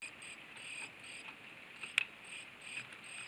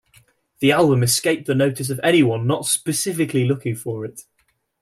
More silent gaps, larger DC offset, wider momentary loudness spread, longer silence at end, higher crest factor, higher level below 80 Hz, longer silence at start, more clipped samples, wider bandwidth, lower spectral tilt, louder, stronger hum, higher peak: neither; neither; about the same, 13 LU vs 11 LU; second, 0 s vs 0.6 s; first, 34 dB vs 16 dB; second, -84 dBFS vs -58 dBFS; second, 0 s vs 0.6 s; neither; first, over 20 kHz vs 16 kHz; second, -0.5 dB/octave vs -4.5 dB/octave; second, -43 LUFS vs -19 LUFS; neither; second, -12 dBFS vs -4 dBFS